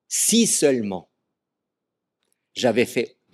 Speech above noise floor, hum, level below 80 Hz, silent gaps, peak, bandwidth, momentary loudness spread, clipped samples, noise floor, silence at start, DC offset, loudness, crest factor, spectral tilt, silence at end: 63 dB; none; -72 dBFS; none; -6 dBFS; 15 kHz; 15 LU; under 0.1%; -83 dBFS; 0.1 s; under 0.1%; -20 LUFS; 18 dB; -3 dB/octave; 0.25 s